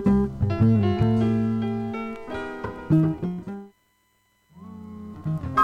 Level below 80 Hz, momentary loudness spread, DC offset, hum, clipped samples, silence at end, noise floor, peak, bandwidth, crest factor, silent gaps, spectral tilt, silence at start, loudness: -44 dBFS; 19 LU; under 0.1%; none; under 0.1%; 0 s; -67 dBFS; -8 dBFS; 7 kHz; 16 dB; none; -9.5 dB/octave; 0 s; -24 LUFS